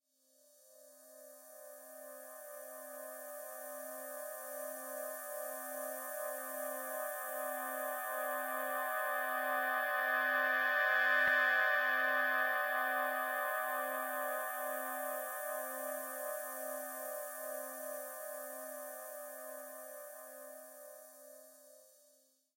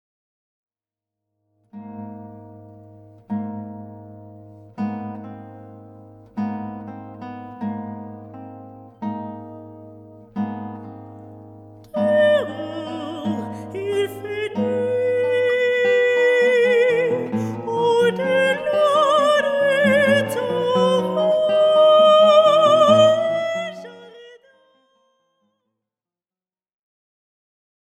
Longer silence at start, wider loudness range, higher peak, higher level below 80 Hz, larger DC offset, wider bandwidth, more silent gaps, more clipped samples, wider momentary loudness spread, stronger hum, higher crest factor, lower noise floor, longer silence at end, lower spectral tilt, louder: second, 0.65 s vs 1.75 s; about the same, 17 LU vs 18 LU; second, -20 dBFS vs -2 dBFS; second, under -90 dBFS vs -66 dBFS; neither; first, 16.5 kHz vs 13.5 kHz; neither; neither; second, 20 LU vs 24 LU; neither; about the same, 20 dB vs 18 dB; second, -71 dBFS vs under -90 dBFS; second, 0.7 s vs 3.7 s; second, 0.5 dB/octave vs -5 dB/octave; second, -37 LUFS vs -18 LUFS